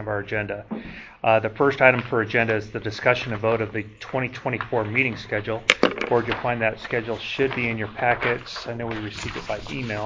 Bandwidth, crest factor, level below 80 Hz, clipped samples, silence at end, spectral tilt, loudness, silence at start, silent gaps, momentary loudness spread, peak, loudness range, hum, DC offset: 7.6 kHz; 24 dB; -50 dBFS; under 0.1%; 0 s; -5.5 dB/octave; -23 LUFS; 0 s; none; 11 LU; 0 dBFS; 3 LU; none; under 0.1%